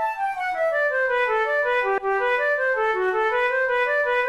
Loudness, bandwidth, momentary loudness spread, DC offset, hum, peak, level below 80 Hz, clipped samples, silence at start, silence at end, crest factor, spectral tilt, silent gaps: -22 LUFS; 12.5 kHz; 2 LU; 0.1%; none; -14 dBFS; -56 dBFS; under 0.1%; 0 s; 0 s; 8 dB; -3 dB/octave; none